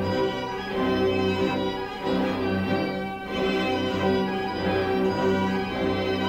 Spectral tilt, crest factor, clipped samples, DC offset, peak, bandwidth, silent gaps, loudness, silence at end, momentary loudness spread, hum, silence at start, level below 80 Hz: -6.5 dB/octave; 14 dB; under 0.1%; under 0.1%; -12 dBFS; 16 kHz; none; -25 LUFS; 0 s; 5 LU; none; 0 s; -48 dBFS